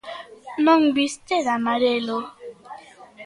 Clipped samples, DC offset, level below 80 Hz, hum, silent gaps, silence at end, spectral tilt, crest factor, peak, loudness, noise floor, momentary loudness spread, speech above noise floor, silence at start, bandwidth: under 0.1%; under 0.1%; -68 dBFS; none; none; 0 s; -3.5 dB/octave; 16 dB; -6 dBFS; -21 LUFS; -44 dBFS; 24 LU; 24 dB; 0.05 s; 11.5 kHz